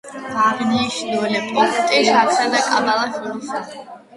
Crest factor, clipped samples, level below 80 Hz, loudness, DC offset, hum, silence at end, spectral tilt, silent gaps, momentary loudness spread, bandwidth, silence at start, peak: 16 dB; under 0.1%; -60 dBFS; -18 LUFS; under 0.1%; none; 0.2 s; -3 dB/octave; none; 13 LU; 11.5 kHz; 0.05 s; -2 dBFS